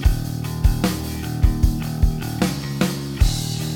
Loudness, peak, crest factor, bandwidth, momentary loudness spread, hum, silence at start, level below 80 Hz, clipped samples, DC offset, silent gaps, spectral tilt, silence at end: -22 LUFS; -4 dBFS; 16 dB; 17.5 kHz; 5 LU; none; 0 s; -22 dBFS; under 0.1%; under 0.1%; none; -5.5 dB/octave; 0 s